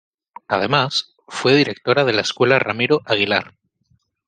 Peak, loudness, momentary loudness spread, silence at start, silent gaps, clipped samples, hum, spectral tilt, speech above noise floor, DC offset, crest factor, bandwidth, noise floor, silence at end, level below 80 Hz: -2 dBFS; -18 LUFS; 6 LU; 0.5 s; none; under 0.1%; none; -4.5 dB/octave; 46 dB; under 0.1%; 18 dB; 9.8 kHz; -63 dBFS; 0.8 s; -62 dBFS